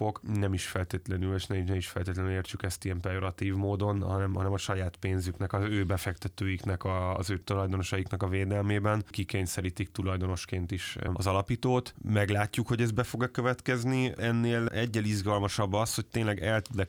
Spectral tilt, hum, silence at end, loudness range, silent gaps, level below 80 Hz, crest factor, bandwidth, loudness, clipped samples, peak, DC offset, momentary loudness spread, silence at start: -6 dB/octave; none; 0 s; 3 LU; none; -54 dBFS; 18 dB; 16.5 kHz; -31 LUFS; under 0.1%; -12 dBFS; under 0.1%; 5 LU; 0 s